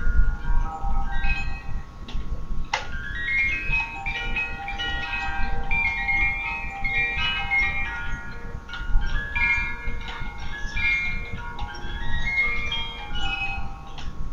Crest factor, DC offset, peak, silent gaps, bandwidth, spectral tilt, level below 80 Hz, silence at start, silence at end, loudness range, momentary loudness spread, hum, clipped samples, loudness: 18 dB; under 0.1%; -6 dBFS; none; 7.2 kHz; -4 dB/octave; -28 dBFS; 0 s; 0 s; 4 LU; 14 LU; none; under 0.1%; -26 LUFS